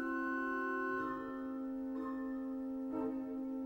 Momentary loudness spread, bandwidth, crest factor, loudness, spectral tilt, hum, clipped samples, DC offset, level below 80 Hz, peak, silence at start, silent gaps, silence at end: 5 LU; 16.5 kHz; 12 dB; -40 LUFS; -7 dB/octave; none; under 0.1%; under 0.1%; -68 dBFS; -28 dBFS; 0 s; none; 0 s